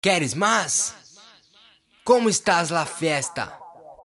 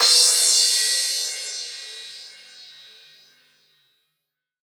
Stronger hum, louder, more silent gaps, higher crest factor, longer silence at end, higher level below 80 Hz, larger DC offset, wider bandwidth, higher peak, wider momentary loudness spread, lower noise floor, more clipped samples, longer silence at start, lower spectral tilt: neither; second, -21 LUFS vs -17 LUFS; neither; about the same, 20 dB vs 20 dB; second, 0.2 s vs 2 s; first, -64 dBFS vs under -90 dBFS; neither; second, 11.5 kHz vs over 20 kHz; about the same, -4 dBFS vs -2 dBFS; second, 11 LU vs 24 LU; second, -56 dBFS vs -81 dBFS; neither; about the same, 0.05 s vs 0 s; first, -3 dB/octave vs 5.5 dB/octave